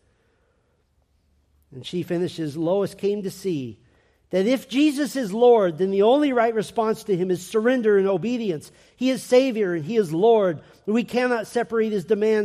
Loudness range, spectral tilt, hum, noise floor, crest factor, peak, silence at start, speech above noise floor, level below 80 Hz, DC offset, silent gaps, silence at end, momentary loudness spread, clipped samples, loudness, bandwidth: 8 LU; -6 dB/octave; none; -66 dBFS; 16 dB; -6 dBFS; 1.7 s; 45 dB; -66 dBFS; under 0.1%; none; 0 s; 10 LU; under 0.1%; -22 LUFS; 15 kHz